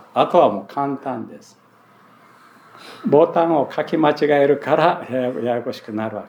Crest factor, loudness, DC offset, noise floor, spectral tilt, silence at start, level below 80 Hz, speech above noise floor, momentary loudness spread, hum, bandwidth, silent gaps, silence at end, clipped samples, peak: 18 dB; -19 LUFS; under 0.1%; -51 dBFS; -7 dB/octave; 0.15 s; -80 dBFS; 32 dB; 12 LU; none; 19 kHz; none; 0 s; under 0.1%; 0 dBFS